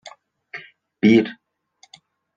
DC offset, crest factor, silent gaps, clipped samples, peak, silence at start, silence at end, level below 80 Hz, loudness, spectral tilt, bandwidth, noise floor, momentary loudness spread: under 0.1%; 20 dB; none; under 0.1%; -4 dBFS; 0.55 s; 1.05 s; -72 dBFS; -18 LUFS; -7 dB/octave; 7.4 kHz; -58 dBFS; 22 LU